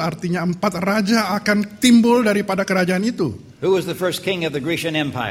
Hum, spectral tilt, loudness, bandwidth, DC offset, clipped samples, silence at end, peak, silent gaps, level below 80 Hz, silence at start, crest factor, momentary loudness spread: none; -5 dB/octave; -19 LUFS; 16 kHz; under 0.1%; under 0.1%; 0 s; -2 dBFS; none; -54 dBFS; 0 s; 16 dB; 8 LU